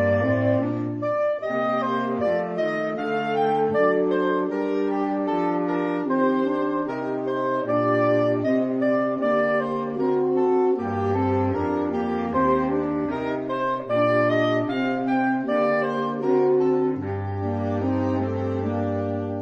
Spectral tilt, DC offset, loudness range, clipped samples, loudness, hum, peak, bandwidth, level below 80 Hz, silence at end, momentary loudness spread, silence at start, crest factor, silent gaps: -8.5 dB/octave; under 0.1%; 2 LU; under 0.1%; -23 LUFS; none; -10 dBFS; 6.8 kHz; -58 dBFS; 0 s; 5 LU; 0 s; 14 dB; none